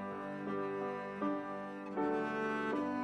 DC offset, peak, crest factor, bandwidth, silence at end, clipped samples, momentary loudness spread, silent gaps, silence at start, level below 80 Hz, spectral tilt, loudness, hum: under 0.1%; -24 dBFS; 14 dB; 9.4 kHz; 0 s; under 0.1%; 6 LU; none; 0 s; -74 dBFS; -7 dB/octave; -38 LUFS; none